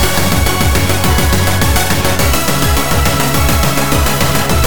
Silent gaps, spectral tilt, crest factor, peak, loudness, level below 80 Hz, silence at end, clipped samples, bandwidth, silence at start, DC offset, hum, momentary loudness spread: none; -4 dB/octave; 12 dB; 0 dBFS; -12 LUFS; -18 dBFS; 0 s; under 0.1%; 19.5 kHz; 0 s; 10%; none; 1 LU